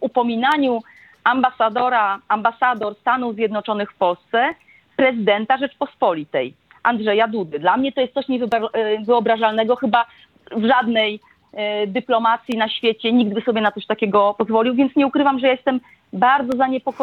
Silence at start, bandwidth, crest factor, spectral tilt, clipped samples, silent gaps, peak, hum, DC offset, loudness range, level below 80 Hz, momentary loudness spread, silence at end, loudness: 0 s; 7.2 kHz; 18 dB; -6.5 dB/octave; under 0.1%; none; -2 dBFS; none; under 0.1%; 2 LU; -66 dBFS; 6 LU; 0 s; -19 LUFS